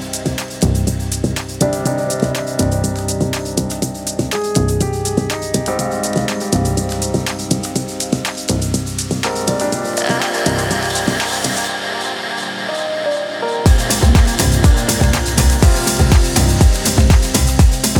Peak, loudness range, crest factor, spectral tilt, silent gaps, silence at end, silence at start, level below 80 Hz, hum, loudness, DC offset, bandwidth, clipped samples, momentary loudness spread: 0 dBFS; 6 LU; 16 dB; -4.5 dB/octave; none; 0 s; 0 s; -20 dBFS; none; -16 LUFS; under 0.1%; 19 kHz; under 0.1%; 8 LU